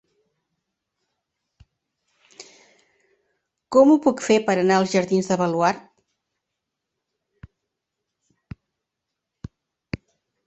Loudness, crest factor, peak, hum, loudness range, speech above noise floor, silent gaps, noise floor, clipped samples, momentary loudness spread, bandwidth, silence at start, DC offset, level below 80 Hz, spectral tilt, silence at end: -19 LUFS; 22 dB; -4 dBFS; none; 18 LU; 65 dB; none; -83 dBFS; under 0.1%; 26 LU; 8.4 kHz; 2.4 s; under 0.1%; -58 dBFS; -5.5 dB/octave; 4.65 s